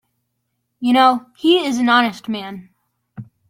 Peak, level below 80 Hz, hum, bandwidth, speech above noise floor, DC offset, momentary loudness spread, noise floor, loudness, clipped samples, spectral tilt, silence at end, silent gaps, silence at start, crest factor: -2 dBFS; -66 dBFS; none; 16.5 kHz; 56 dB; under 0.1%; 14 LU; -73 dBFS; -16 LUFS; under 0.1%; -4 dB/octave; 0.25 s; none; 0.8 s; 18 dB